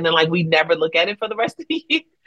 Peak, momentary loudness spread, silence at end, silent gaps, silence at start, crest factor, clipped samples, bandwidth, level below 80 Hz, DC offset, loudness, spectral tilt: -2 dBFS; 7 LU; 0.25 s; none; 0 s; 18 dB; under 0.1%; 9.8 kHz; -68 dBFS; under 0.1%; -19 LUFS; -5.5 dB/octave